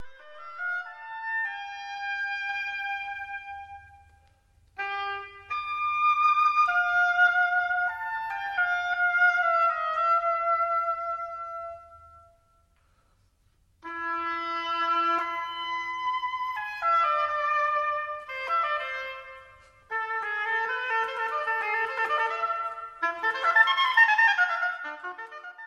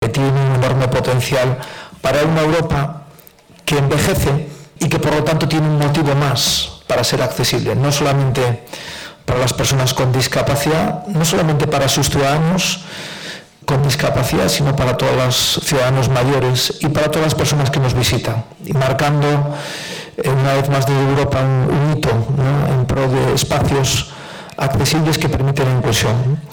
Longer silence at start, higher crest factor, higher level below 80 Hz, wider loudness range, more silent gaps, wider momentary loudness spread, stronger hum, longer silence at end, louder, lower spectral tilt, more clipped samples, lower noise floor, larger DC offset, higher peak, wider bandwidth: about the same, 0 s vs 0 s; first, 20 dB vs 8 dB; second, -66 dBFS vs -36 dBFS; first, 10 LU vs 2 LU; neither; first, 15 LU vs 8 LU; neither; about the same, 0 s vs 0 s; second, -26 LUFS vs -16 LUFS; second, -2 dB/octave vs -5 dB/octave; neither; first, -66 dBFS vs -44 dBFS; neither; about the same, -8 dBFS vs -8 dBFS; second, 13 kHz vs 19.5 kHz